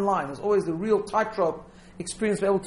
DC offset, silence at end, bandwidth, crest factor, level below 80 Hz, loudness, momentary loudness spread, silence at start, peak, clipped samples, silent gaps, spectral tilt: under 0.1%; 0 s; 11.5 kHz; 16 dB; -56 dBFS; -26 LUFS; 11 LU; 0 s; -10 dBFS; under 0.1%; none; -5.5 dB/octave